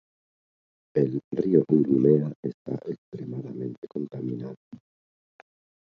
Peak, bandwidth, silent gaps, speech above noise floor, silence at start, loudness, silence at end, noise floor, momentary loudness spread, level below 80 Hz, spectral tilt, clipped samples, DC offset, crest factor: -6 dBFS; 5.8 kHz; 1.24-1.31 s, 2.35-2.43 s, 2.54-2.65 s, 2.98-3.12 s, 3.78-3.82 s, 4.57-4.71 s; over 64 dB; 0.95 s; -26 LUFS; 1.2 s; under -90 dBFS; 16 LU; -70 dBFS; -11.5 dB/octave; under 0.1%; under 0.1%; 22 dB